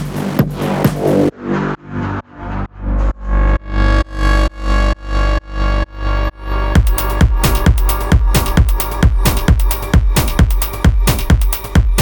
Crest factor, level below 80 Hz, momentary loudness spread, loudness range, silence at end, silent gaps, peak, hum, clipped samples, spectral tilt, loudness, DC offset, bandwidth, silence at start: 12 dB; -16 dBFS; 8 LU; 4 LU; 0 s; none; 0 dBFS; 50 Hz at -30 dBFS; under 0.1%; -5.5 dB/octave; -16 LUFS; under 0.1%; over 20 kHz; 0 s